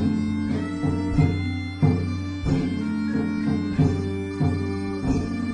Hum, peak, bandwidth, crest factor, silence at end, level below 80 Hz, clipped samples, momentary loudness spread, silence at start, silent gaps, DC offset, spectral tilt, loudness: none; -8 dBFS; 10 kHz; 16 dB; 0 s; -40 dBFS; under 0.1%; 5 LU; 0 s; none; under 0.1%; -8 dB/octave; -25 LUFS